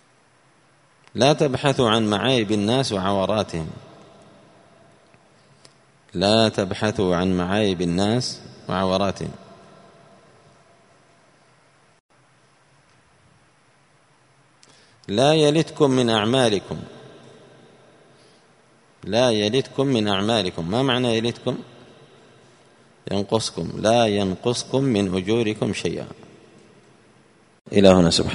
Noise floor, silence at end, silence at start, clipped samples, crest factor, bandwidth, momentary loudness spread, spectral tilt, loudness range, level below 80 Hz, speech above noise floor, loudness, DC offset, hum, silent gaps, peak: -58 dBFS; 0 s; 1.15 s; under 0.1%; 24 dB; 11 kHz; 15 LU; -5 dB/octave; 6 LU; -54 dBFS; 38 dB; -21 LUFS; under 0.1%; none; 12.00-12.09 s, 27.61-27.65 s; 0 dBFS